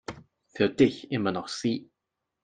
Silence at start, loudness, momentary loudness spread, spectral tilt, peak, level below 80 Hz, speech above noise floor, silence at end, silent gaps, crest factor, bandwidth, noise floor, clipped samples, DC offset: 0.1 s; -27 LUFS; 15 LU; -5.5 dB/octave; -8 dBFS; -64 dBFS; 58 dB; 0.6 s; none; 20 dB; 9.6 kHz; -84 dBFS; under 0.1%; under 0.1%